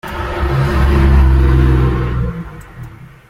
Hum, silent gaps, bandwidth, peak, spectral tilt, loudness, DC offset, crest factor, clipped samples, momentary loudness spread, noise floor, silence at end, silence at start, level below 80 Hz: none; none; 6.4 kHz; -2 dBFS; -8 dB/octave; -14 LUFS; under 0.1%; 12 dB; under 0.1%; 22 LU; -33 dBFS; 0.2 s; 0.05 s; -16 dBFS